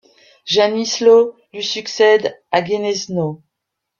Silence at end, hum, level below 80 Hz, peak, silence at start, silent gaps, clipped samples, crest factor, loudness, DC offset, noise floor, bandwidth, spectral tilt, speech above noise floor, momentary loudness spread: 0.65 s; none; -62 dBFS; -2 dBFS; 0.45 s; none; under 0.1%; 16 dB; -16 LUFS; under 0.1%; -78 dBFS; 7.2 kHz; -3.5 dB/octave; 63 dB; 11 LU